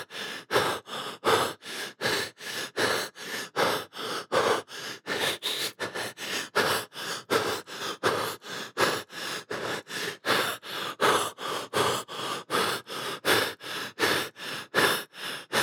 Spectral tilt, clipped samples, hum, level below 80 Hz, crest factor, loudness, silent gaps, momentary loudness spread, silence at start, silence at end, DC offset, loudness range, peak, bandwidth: -2 dB/octave; under 0.1%; none; -74 dBFS; 22 dB; -29 LUFS; none; 10 LU; 0 s; 0 s; under 0.1%; 2 LU; -8 dBFS; over 20 kHz